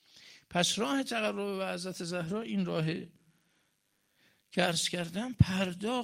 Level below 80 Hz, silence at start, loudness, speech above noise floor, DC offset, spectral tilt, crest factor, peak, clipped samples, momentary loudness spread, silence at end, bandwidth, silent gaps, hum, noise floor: -54 dBFS; 0.15 s; -32 LUFS; 44 dB; under 0.1%; -4.5 dB/octave; 24 dB; -10 dBFS; under 0.1%; 8 LU; 0 s; 16 kHz; none; none; -76 dBFS